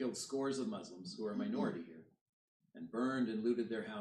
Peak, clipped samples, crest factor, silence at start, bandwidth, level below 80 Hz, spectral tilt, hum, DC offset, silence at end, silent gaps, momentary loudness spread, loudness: -24 dBFS; under 0.1%; 16 dB; 0 s; 12.5 kHz; -86 dBFS; -5 dB/octave; none; under 0.1%; 0 s; 2.21-2.60 s; 12 LU; -40 LUFS